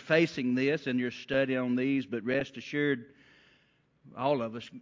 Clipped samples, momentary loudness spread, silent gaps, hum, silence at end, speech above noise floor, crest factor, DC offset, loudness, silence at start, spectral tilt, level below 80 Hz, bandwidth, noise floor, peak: under 0.1%; 6 LU; none; none; 0 s; 38 dB; 20 dB; under 0.1%; -30 LUFS; 0 s; -6.5 dB/octave; -70 dBFS; 7.6 kHz; -68 dBFS; -12 dBFS